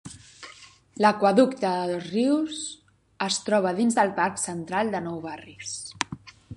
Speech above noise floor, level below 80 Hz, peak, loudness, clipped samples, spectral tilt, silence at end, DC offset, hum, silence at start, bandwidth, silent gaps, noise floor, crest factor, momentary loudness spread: 25 dB; -62 dBFS; -4 dBFS; -25 LUFS; under 0.1%; -4 dB/octave; 0 s; under 0.1%; none; 0.05 s; 11.5 kHz; none; -50 dBFS; 22 dB; 22 LU